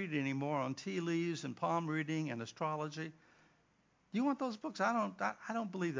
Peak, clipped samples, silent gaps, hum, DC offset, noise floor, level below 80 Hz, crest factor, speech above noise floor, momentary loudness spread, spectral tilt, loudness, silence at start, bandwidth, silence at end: -20 dBFS; under 0.1%; none; none; under 0.1%; -74 dBFS; -84 dBFS; 18 dB; 36 dB; 6 LU; -6 dB/octave; -38 LUFS; 0 s; 7.6 kHz; 0 s